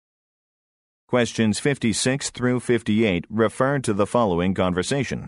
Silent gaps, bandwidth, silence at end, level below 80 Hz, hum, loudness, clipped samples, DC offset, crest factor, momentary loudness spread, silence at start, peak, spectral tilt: none; 11.5 kHz; 0 s; -52 dBFS; none; -22 LUFS; under 0.1%; under 0.1%; 18 dB; 3 LU; 1.1 s; -6 dBFS; -5 dB/octave